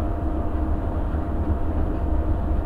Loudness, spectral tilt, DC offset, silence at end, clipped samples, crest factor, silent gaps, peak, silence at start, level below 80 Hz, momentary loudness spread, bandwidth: -26 LUFS; -10.5 dB/octave; under 0.1%; 0 s; under 0.1%; 12 dB; none; -12 dBFS; 0 s; -24 dBFS; 2 LU; 3.9 kHz